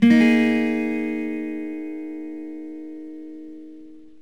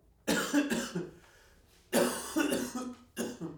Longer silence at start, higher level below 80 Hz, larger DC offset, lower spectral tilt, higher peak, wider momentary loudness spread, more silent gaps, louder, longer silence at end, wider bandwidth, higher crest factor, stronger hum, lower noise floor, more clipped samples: second, 0 s vs 0.25 s; second, -72 dBFS vs -64 dBFS; first, 0.5% vs under 0.1%; first, -6.5 dB/octave vs -3.5 dB/octave; first, -4 dBFS vs -14 dBFS; first, 23 LU vs 11 LU; neither; first, -22 LUFS vs -33 LUFS; first, 0.2 s vs 0 s; second, 9.2 kHz vs over 20 kHz; about the same, 18 dB vs 22 dB; neither; second, -44 dBFS vs -62 dBFS; neither